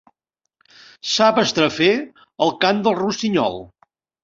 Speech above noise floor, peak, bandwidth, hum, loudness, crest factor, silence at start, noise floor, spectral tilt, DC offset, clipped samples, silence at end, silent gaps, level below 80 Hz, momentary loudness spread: 61 dB; 0 dBFS; 7.8 kHz; none; -18 LUFS; 20 dB; 1.05 s; -80 dBFS; -4 dB/octave; under 0.1%; under 0.1%; 0.55 s; none; -60 dBFS; 10 LU